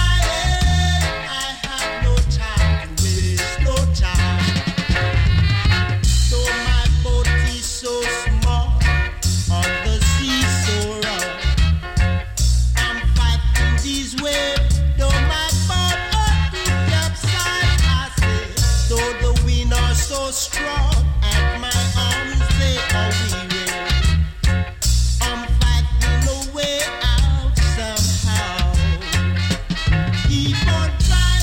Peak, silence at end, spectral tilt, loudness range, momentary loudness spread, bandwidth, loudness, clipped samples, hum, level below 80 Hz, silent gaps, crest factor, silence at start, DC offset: -4 dBFS; 0 s; -4 dB/octave; 1 LU; 4 LU; 17 kHz; -19 LUFS; under 0.1%; none; -20 dBFS; none; 14 dB; 0 s; under 0.1%